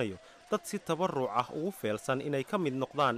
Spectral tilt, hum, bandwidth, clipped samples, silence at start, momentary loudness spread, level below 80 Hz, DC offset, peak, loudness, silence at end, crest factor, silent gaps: -5.5 dB/octave; none; 15.5 kHz; under 0.1%; 0 s; 5 LU; -72 dBFS; under 0.1%; -16 dBFS; -33 LUFS; 0 s; 16 dB; none